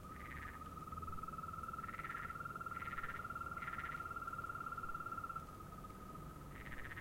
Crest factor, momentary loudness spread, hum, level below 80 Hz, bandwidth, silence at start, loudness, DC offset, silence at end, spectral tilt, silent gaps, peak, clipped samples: 16 dB; 8 LU; none; -60 dBFS; 16.5 kHz; 0 s; -47 LUFS; under 0.1%; 0 s; -5.5 dB/octave; none; -32 dBFS; under 0.1%